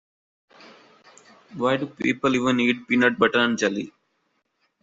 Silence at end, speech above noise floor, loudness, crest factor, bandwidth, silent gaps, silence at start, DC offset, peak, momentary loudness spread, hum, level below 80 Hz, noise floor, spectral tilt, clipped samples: 0.95 s; 50 dB; -22 LUFS; 20 dB; 7.8 kHz; none; 1.5 s; under 0.1%; -4 dBFS; 10 LU; none; -64 dBFS; -72 dBFS; -4.5 dB/octave; under 0.1%